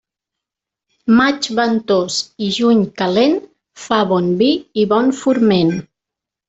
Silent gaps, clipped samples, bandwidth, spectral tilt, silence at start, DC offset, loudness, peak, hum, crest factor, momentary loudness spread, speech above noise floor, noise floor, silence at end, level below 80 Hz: none; under 0.1%; 8.2 kHz; -5 dB/octave; 1.05 s; under 0.1%; -15 LUFS; -2 dBFS; none; 14 dB; 7 LU; 70 dB; -84 dBFS; 0.65 s; -56 dBFS